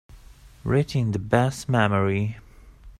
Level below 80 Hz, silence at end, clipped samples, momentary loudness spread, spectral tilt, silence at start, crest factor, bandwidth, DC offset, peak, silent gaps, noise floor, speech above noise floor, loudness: -46 dBFS; 0.1 s; under 0.1%; 10 LU; -7 dB/octave; 0.15 s; 20 dB; 14 kHz; under 0.1%; -4 dBFS; none; -48 dBFS; 25 dB; -23 LUFS